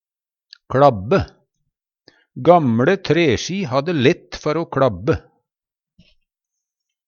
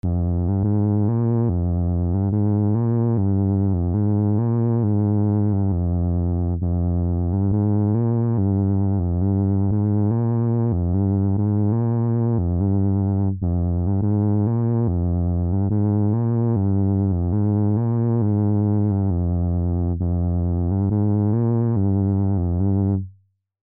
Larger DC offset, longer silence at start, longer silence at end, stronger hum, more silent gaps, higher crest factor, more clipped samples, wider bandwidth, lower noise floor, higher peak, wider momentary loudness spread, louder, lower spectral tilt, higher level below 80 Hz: neither; first, 0.7 s vs 0.05 s; first, 1.9 s vs 0.5 s; neither; neither; first, 20 dB vs 8 dB; neither; first, 7.2 kHz vs 1.9 kHz; first, under -90 dBFS vs -58 dBFS; first, 0 dBFS vs -12 dBFS; first, 9 LU vs 2 LU; first, -18 LUFS vs -21 LUFS; second, -6.5 dB/octave vs -15 dB/octave; second, -46 dBFS vs -36 dBFS